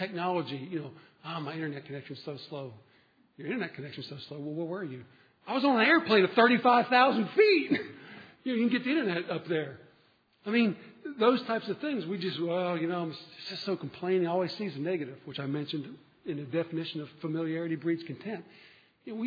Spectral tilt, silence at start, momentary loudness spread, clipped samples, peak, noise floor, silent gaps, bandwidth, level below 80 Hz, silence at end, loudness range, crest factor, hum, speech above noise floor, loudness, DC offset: -7.5 dB/octave; 0 s; 18 LU; under 0.1%; -8 dBFS; -66 dBFS; none; 5 kHz; -82 dBFS; 0 s; 15 LU; 22 dB; none; 37 dB; -30 LUFS; under 0.1%